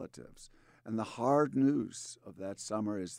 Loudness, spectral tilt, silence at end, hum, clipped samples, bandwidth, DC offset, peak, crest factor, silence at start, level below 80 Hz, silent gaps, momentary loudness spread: -33 LUFS; -6 dB/octave; 0 s; none; under 0.1%; 11.5 kHz; under 0.1%; -18 dBFS; 18 dB; 0 s; -70 dBFS; none; 21 LU